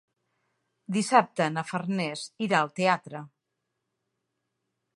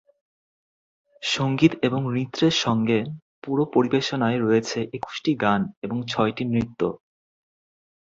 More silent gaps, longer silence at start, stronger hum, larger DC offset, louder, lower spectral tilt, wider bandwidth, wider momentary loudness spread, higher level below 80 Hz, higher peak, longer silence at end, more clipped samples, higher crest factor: second, none vs 3.22-3.42 s, 5.77-5.82 s; second, 0.9 s vs 1.2 s; neither; neither; second, -27 LUFS vs -23 LUFS; about the same, -5 dB/octave vs -5.5 dB/octave; first, 11.5 kHz vs 7.8 kHz; about the same, 10 LU vs 9 LU; second, -80 dBFS vs -58 dBFS; about the same, -4 dBFS vs -4 dBFS; first, 1.7 s vs 1.05 s; neither; first, 26 dB vs 20 dB